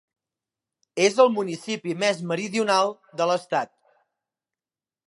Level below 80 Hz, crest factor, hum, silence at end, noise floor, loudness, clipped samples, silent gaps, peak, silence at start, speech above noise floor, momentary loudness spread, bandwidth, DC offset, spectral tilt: -82 dBFS; 22 dB; none; 1.4 s; under -90 dBFS; -23 LUFS; under 0.1%; none; -4 dBFS; 0.95 s; over 67 dB; 10 LU; 11.5 kHz; under 0.1%; -4 dB/octave